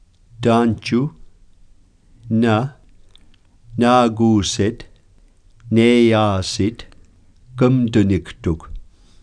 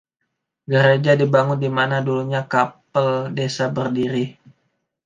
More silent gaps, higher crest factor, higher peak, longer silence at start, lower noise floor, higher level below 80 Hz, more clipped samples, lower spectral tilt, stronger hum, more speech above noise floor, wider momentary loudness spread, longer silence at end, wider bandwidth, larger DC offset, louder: neither; about the same, 18 dB vs 18 dB; about the same, 0 dBFS vs -2 dBFS; second, 0.4 s vs 0.7 s; second, -50 dBFS vs -76 dBFS; first, -42 dBFS vs -64 dBFS; neither; about the same, -6 dB/octave vs -6.5 dB/octave; neither; second, 34 dB vs 58 dB; first, 13 LU vs 7 LU; second, 0.4 s vs 0.75 s; first, 10.5 kHz vs 9.2 kHz; neither; about the same, -17 LUFS vs -19 LUFS